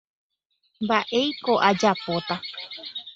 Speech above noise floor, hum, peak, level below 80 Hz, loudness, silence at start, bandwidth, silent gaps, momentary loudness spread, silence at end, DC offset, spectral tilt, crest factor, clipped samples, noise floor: 47 dB; none; -4 dBFS; -66 dBFS; -24 LUFS; 0.8 s; 8 kHz; none; 14 LU; 0 s; under 0.1%; -4.5 dB/octave; 22 dB; under 0.1%; -71 dBFS